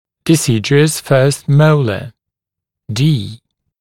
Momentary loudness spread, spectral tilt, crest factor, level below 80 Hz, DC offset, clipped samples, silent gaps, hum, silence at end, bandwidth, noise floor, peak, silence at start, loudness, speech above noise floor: 13 LU; -5.5 dB/octave; 14 dB; -52 dBFS; under 0.1%; under 0.1%; none; none; 0.45 s; 16 kHz; -83 dBFS; 0 dBFS; 0.25 s; -13 LUFS; 71 dB